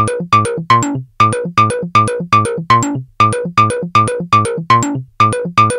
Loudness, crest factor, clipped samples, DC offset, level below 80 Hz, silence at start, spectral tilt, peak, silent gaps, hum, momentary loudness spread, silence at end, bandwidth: -13 LUFS; 12 dB; under 0.1%; under 0.1%; -46 dBFS; 0 s; -5 dB/octave; 0 dBFS; none; none; 2 LU; 0 s; 15 kHz